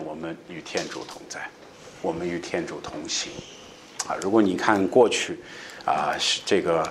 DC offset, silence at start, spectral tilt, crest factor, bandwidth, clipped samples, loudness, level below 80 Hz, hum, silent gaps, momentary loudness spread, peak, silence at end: under 0.1%; 0 s; -3.5 dB/octave; 24 dB; 14 kHz; under 0.1%; -25 LUFS; -60 dBFS; none; none; 19 LU; -2 dBFS; 0 s